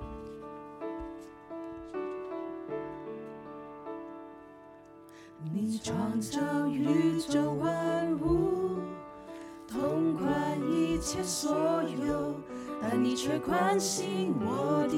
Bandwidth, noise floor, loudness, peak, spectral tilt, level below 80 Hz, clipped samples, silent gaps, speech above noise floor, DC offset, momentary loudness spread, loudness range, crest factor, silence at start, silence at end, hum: 16 kHz; -52 dBFS; -31 LUFS; -16 dBFS; -5 dB/octave; -54 dBFS; under 0.1%; none; 22 dB; under 0.1%; 17 LU; 11 LU; 16 dB; 0 s; 0 s; none